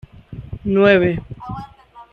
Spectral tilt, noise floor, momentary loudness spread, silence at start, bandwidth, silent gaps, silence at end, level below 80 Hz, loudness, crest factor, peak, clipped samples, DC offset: -8.5 dB/octave; -41 dBFS; 22 LU; 0.3 s; 6 kHz; none; 0.1 s; -42 dBFS; -16 LUFS; 18 dB; 0 dBFS; under 0.1%; under 0.1%